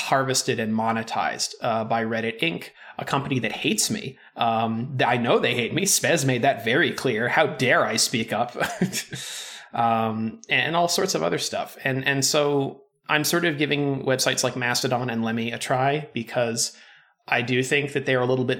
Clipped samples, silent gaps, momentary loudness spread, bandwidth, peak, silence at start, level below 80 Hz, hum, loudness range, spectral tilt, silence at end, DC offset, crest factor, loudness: under 0.1%; none; 7 LU; 19 kHz; -4 dBFS; 0 s; -66 dBFS; none; 4 LU; -3.5 dB/octave; 0 s; under 0.1%; 20 dB; -23 LUFS